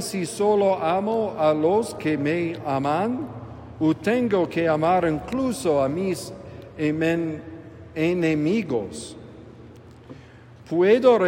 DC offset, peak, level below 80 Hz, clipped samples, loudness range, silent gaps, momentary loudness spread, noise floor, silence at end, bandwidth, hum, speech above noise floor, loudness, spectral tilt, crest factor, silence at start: under 0.1%; -6 dBFS; -56 dBFS; under 0.1%; 4 LU; none; 17 LU; -46 dBFS; 0 s; 16 kHz; none; 24 dB; -23 LUFS; -6 dB/octave; 18 dB; 0 s